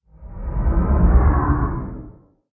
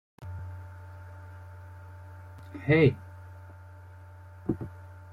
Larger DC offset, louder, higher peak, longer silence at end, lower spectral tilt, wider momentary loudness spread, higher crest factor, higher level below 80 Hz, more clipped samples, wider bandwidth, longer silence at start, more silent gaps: neither; first, -20 LUFS vs -29 LUFS; first, -4 dBFS vs -10 dBFS; first, 0.45 s vs 0 s; first, -14.5 dB/octave vs -9 dB/octave; second, 19 LU vs 26 LU; second, 16 dB vs 22 dB; first, -20 dBFS vs -58 dBFS; neither; second, 2.5 kHz vs 5.8 kHz; about the same, 0.2 s vs 0.2 s; neither